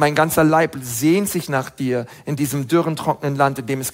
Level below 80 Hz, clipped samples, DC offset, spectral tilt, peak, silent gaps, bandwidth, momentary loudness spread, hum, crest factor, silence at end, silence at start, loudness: -52 dBFS; under 0.1%; under 0.1%; -5.5 dB/octave; -2 dBFS; none; 16.5 kHz; 8 LU; none; 16 dB; 0 s; 0 s; -19 LUFS